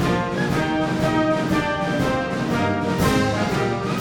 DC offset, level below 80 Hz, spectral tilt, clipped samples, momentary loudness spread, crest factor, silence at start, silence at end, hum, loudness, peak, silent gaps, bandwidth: under 0.1%; -40 dBFS; -6 dB/octave; under 0.1%; 3 LU; 14 dB; 0 s; 0 s; none; -21 LUFS; -8 dBFS; none; over 20 kHz